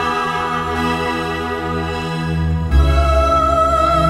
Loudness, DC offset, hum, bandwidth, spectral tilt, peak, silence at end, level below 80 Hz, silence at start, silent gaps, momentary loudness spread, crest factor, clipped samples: -17 LUFS; under 0.1%; none; 13 kHz; -6.5 dB/octave; -2 dBFS; 0 s; -22 dBFS; 0 s; none; 7 LU; 14 dB; under 0.1%